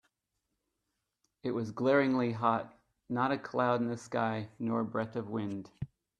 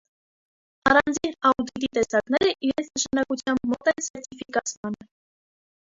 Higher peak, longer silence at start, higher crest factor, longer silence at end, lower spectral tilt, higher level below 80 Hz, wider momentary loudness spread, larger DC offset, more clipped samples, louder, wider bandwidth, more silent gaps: second, -14 dBFS vs -4 dBFS; first, 1.45 s vs 0.85 s; about the same, 20 dB vs 22 dB; second, 0.35 s vs 1 s; first, -7 dB/octave vs -3 dB/octave; second, -70 dBFS vs -56 dBFS; about the same, 13 LU vs 12 LU; neither; neither; second, -33 LUFS vs -24 LUFS; first, 9.8 kHz vs 7.8 kHz; second, none vs 4.10-4.14 s, 4.77-4.83 s